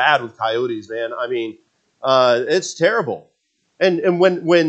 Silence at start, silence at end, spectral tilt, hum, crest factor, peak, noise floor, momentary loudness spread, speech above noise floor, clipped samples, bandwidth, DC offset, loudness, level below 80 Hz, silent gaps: 0 s; 0 s; -4.5 dB/octave; none; 18 dB; 0 dBFS; -62 dBFS; 11 LU; 44 dB; under 0.1%; 8.6 kHz; under 0.1%; -18 LUFS; -74 dBFS; none